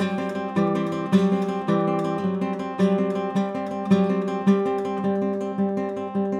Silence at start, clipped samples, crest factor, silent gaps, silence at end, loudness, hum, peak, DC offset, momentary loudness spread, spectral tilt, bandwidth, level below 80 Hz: 0 s; under 0.1%; 16 dB; none; 0 s; -24 LUFS; none; -8 dBFS; under 0.1%; 6 LU; -8 dB/octave; 9 kHz; -68 dBFS